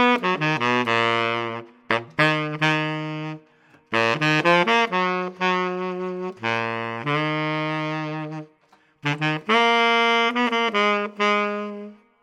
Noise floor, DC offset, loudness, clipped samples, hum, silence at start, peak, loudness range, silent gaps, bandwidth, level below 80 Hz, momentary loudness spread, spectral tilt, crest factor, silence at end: -59 dBFS; under 0.1%; -22 LUFS; under 0.1%; none; 0 s; -2 dBFS; 5 LU; none; 12 kHz; -74 dBFS; 13 LU; -5 dB/octave; 20 dB; 0.3 s